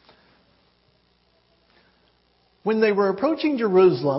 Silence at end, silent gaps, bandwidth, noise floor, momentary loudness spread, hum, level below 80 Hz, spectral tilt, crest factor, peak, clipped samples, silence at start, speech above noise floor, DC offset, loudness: 0 s; none; 5.8 kHz; -63 dBFS; 7 LU; 60 Hz at -65 dBFS; -68 dBFS; -10.5 dB/octave; 16 dB; -6 dBFS; under 0.1%; 2.65 s; 44 dB; under 0.1%; -20 LUFS